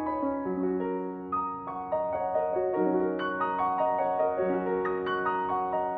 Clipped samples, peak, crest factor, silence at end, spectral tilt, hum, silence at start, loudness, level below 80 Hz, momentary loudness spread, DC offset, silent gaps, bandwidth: under 0.1%; -14 dBFS; 14 dB; 0 s; -9.5 dB/octave; none; 0 s; -29 LUFS; -60 dBFS; 5 LU; under 0.1%; none; 4.8 kHz